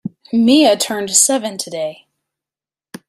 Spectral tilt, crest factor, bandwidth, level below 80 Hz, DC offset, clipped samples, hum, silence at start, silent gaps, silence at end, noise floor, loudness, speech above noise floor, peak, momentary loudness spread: -2.5 dB/octave; 16 dB; 16 kHz; -64 dBFS; under 0.1%; under 0.1%; none; 0.05 s; none; 1.15 s; under -90 dBFS; -14 LUFS; over 76 dB; 0 dBFS; 13 LU